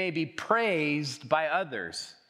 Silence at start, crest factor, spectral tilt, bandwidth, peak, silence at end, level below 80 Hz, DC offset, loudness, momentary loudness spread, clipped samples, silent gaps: 0 s; 20 dB; -4.5 dB/octave; 13 kHz; -10 dBFS; 0.2 s; -76 dBFS; under 0.1%; -29 LUFS; 9 LU; under 0.1%; none